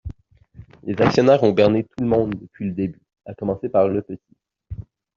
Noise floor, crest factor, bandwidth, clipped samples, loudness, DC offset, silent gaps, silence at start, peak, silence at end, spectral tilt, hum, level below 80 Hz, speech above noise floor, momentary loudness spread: -47 dBFS; 18 dB; 7.4 kHz; under 0.1%; -20 LUFS; under 0.1%; none; 0.05 s; -2 dBFS; 0.35 s; -6.5 dB/octave; none; -48 dBFS; 27 dB; 22 LU